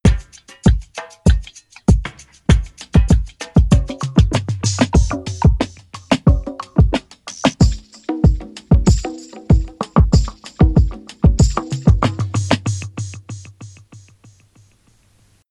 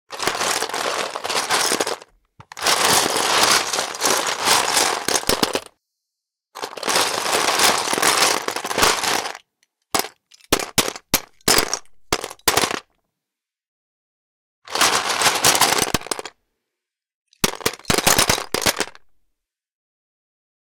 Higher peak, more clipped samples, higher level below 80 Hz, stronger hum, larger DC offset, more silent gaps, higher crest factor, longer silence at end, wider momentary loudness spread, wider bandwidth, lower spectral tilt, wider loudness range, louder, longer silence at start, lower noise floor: first, 0 dBFS vs -4 dBFS; neither; first, -20 dBFS vs -48 dBFS; neither; neither; second, none vs 13.68-14.62 s, 17.14-17.26 s; about the same, 16 dB vs 18 dB; first, 1.8 s vs 1.65 s; about the same, 14 LU vs 12 LU; second, 11 kHz vs 19 kHz; first, -6.5 dB/octave vs -1 dB/octave; about the same, 3 LU vs 4 LU; about the same, -17 LUFS vs -18 LUFS; about the same, 0.05 s vs 0.1 s; second, -55 dBFS vs -85 dBFS